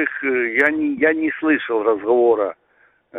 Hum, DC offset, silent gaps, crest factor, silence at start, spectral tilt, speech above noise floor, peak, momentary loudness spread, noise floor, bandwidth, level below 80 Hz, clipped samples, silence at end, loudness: none; under 0.1%; none; 16 dB; 0 s; -6.5 dB/octave; 40 dB; -4 dBFS; 4 LU; -58 dBFS; 3.9 kHz; -62 dBFS; under 0.1%; 0 s; -18 LUFS